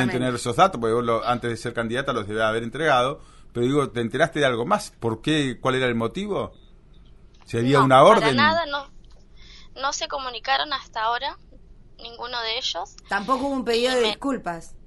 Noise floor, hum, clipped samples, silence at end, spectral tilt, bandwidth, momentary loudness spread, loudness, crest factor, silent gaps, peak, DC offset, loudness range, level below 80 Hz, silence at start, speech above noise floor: -48 dBFS; none; under 0.1%; 0.1 s; -4.5 dB/octave; 11.5 kHz; 11 LU; -22 LUFS; 22 dB; none; -2 dBFS; under 0.1%; 7 LU; -48 dBFS; 0 s; 26 dB